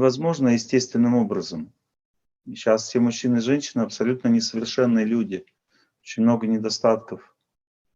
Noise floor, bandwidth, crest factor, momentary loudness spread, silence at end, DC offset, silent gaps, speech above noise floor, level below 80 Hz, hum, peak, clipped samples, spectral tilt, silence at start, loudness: -67 dBFS; 7.8 kHz; 18 dB; 14 LU; 0.75 s; under 0.1%; 2.05-2.14 s; 45 dB; -68 dBFS; none; -4 dBFS; under 0.1%; -5.5 dB/octave; 0 s; -22 LUFS